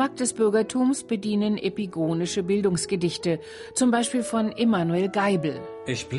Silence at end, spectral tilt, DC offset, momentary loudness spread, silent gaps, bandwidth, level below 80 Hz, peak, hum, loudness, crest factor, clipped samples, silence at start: 0 s; -5 dB/octave; under 0.1%; 7 LU; none; 11.5 kHz; -60 dBFS; -10 dBFS; none; -25 LUFS; 14 dB; under 0.1%; 0 s